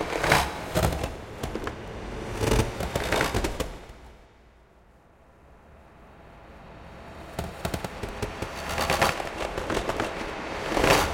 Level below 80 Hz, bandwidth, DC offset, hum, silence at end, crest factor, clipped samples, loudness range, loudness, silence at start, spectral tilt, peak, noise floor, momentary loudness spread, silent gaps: -40 dBFS; 17 kHz; under 0.1%; none; 0 s; 26 dB; under 0.1%; 17 LU; -28 LUFS; 0 s; -4 dB/octave; -2 dBFS; -56 dBFS; 22 LU; none